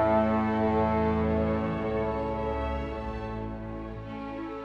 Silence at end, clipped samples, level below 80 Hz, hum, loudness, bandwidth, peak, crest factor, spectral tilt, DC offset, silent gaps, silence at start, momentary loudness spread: 0 s; under 0.1%; -42 dBFS; none; -29 LUFS; 6.6 kHz; -12 dBFS; 16 dB; -9 dB/octave; under 0.1%; none; 0 s; 12 LU